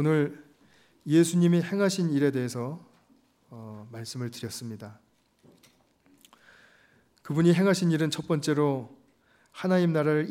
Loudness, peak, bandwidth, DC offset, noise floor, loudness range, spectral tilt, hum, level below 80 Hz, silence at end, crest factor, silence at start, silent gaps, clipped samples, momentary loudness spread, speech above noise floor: -26 LUFS; -10 dBFS; 15.5 kHz; under 0.1%; -64 dBFS; 15 LU; -6.5 dB/octave; none; -74 dBFS; 0 s; 18 dB; 0 s; none; under 0.1%; 21 LU; 38 dB